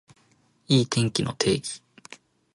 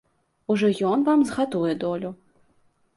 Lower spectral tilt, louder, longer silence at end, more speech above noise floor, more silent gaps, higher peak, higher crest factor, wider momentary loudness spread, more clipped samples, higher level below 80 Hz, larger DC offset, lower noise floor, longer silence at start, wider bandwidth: second, -5 dB/octave vs -6.5 dB/octave; about the same, -24 LUFS vs -23 LUFS; second, 0.4 s vs 0.8 s; about the same, 40 dB vs 41 dB; neither; first, -6 dBFS vs -10 dBFS; first, 20 dB vs 14 dB; first, 24 LU vs 12 LU; neither; first, -56 dBFS vs -64 dBFS; neither; about the same, -63 dBFS vs -64 dBFS; first, 0.7 s vs 0.5 s; about the same, 11.5 kHz vs 11.5 kHz